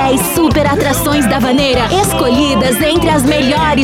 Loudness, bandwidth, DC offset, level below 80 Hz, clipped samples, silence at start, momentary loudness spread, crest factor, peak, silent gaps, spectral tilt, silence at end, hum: -11 LUFS; 17.5 kHz; under 0.1%; -28 dBFS; under 0.1%; 0 s; 1 LU; 10 dB; -2 dBFS; none; -4.5 dB/octave; 0 s; none